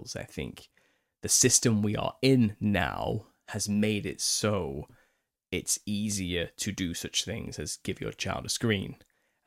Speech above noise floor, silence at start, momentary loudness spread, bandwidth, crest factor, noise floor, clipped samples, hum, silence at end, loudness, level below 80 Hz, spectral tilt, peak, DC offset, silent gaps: 44 dB; 0 s; 15 LU; 16.5 kHz; 22 dB; -74 dBFS; under 0.1%; none; 0.5 s; -28 LUFS; -54 dBFS; -3.5 dB/octave; -8 dBFS; under 0.1%; none